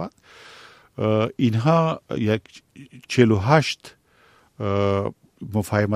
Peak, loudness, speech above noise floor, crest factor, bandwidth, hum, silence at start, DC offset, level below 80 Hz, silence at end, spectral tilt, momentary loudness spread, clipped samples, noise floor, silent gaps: -2 dBFS; -22 LUFS; 36 dB; 22 dB; 14.5 kHz; none; 0 s; under 0.1%; -56 dBFS; 0 s; -6.5 dB/octave; 14 LU; under 0.1%; -57 dBFS; none